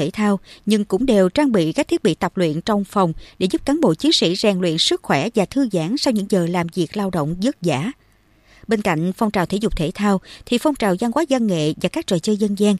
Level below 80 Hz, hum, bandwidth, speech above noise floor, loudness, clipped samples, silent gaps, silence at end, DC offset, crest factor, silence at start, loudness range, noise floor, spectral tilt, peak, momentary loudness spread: -42 dBFS; none; 14.5 kHz; 35 dB; -19 LUFS; under 0.1%; none; 0 s; under 0.1%; 16 dB; 0 s; 4 LU; -54 dBFS; -5.5 dB/octave; -2 dBFS; 6 LU